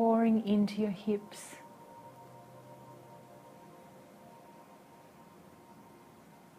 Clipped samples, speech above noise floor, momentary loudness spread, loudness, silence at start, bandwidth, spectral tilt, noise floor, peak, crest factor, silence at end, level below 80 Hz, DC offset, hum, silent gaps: under 0.1%; 26 dB; 27 LU; -31 LUFS; 0 s; 15 kHz; -7 dB/octave; -57 dBFS; -16 dBFS; 20 dB; 3.1 s; -76 dBFS; under 0.1%; none; none